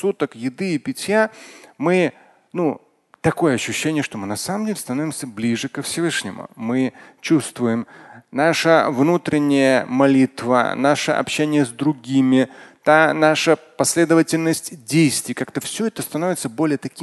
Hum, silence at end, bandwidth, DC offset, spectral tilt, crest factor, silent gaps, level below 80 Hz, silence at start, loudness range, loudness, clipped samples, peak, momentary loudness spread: none; 0 s; 12.5 kHz; under 0.1%; -4.5 dB/octave; 18 dB; none; -60 dBFS; 0 s; 6 LU; -19 LUFS; under 0.1%; 0 dBFS; 10 LU